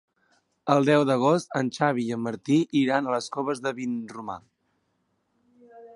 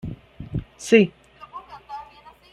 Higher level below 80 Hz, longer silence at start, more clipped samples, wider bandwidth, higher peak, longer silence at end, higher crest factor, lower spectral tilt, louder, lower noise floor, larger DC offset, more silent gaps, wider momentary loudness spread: second, -72 dBFS vs -48 dBFS; first, 0.65 s vs 0.05 s; neither; about the same, 11.5 kHz vs 12.5 kHz; second, -6 dBFS vs -2 dBFS; second, 0.05 s vs 0.5 s; about the same, 20 dB vs 22 dB; about the same, -6 dB/octave vs -5.5 dB/octave; second, -25 LUFS vs -21 LUFS; first, -73 dBFS vs -48 dBFS; neither; neither; second, 15 LU vs 23 LU